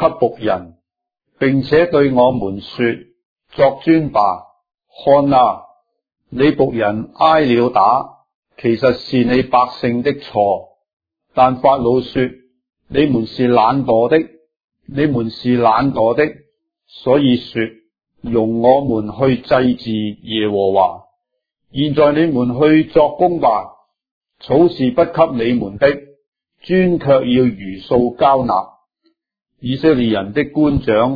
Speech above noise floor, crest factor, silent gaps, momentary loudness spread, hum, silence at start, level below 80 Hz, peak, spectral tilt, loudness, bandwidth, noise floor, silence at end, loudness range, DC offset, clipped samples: 63 dB; 16 dB; 3.25-3.36 s, 8.35-8.43 s, 10.93-10.97 s, 14.64-14.68 s, 24.11-24.21 s, 26.27-26.32 s; 10 LU; none; 0 s; -44 dBFS; 0 dBFS; -9 dB/octave; -15 LUFS; 5 kHz; -77 dBFS; 0 s; 2 LU; under 0.1%; under 0.1%